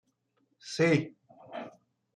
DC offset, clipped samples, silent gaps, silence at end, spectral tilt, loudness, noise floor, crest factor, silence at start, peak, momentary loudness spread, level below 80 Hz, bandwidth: under 0.1%; under 0.1%; none; 0.45 s; -6 dB/octave; -28 LUFS; -75 dBFS; 20 dB; 0.65 s; -14 dBFS; 21 LU; -74 dBFS; 10.5 kHz